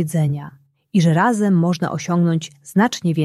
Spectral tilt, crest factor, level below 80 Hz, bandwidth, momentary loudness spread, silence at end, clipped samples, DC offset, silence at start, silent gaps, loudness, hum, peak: -6.5 dB/octave; 14 dB; -60 dBFS; 13 kHz; 7 LU; 0 s; under 0.1%; under 0.1%; 0 s; none; -18 LUFS; none; -4 dBFS